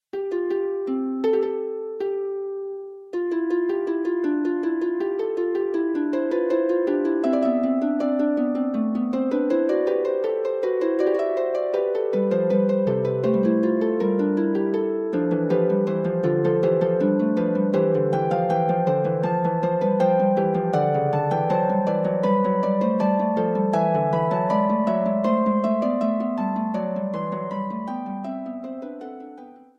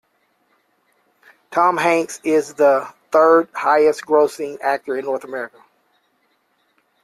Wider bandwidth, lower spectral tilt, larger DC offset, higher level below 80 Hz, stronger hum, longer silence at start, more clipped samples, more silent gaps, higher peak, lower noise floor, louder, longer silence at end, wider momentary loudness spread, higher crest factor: second, 7.2 kHz vs 14 kHz; first, -9.5 dB/octave vs -4.5 dB/octave; neither; about the same, -66 dBFS vs -68 dBFS; neither; second, 0.15 s vs 1.5 s; neither; neither; second, -8 dBFS vs -2 dBFS; second, -43 dBFS vs -65 dBFS; second, -23 LUFS vs -18 LUFS; second, 0.25 s vs 1.55 s; second, 8 LU vs 11 LU; about the same, 14 dB vs 16 dB